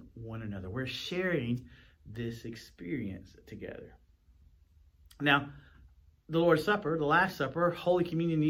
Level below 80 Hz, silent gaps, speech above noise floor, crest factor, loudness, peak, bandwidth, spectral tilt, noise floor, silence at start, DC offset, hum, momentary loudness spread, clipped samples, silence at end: -60 dBFS; none; 31 dB; 22 dB; -31 LUFS; -12 dBFS; 16.5 kHz; -6.5 dB/octave; -62 dBFS; 0 s; under 0.1%; none; 18 LU; under 0.1%; 0 s